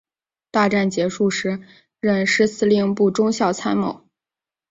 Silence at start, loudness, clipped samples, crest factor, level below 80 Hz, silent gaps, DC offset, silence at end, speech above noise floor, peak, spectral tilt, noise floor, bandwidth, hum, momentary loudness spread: 0.55 s; -20 LUFS; under 0.1%; 16 dB; -60 dBFS; none; under 0.1%; 0.75 s; 71 dB; -4 dBFS; -5 dB/octave; -90 dBFS; 8 kHz; none; 9 LU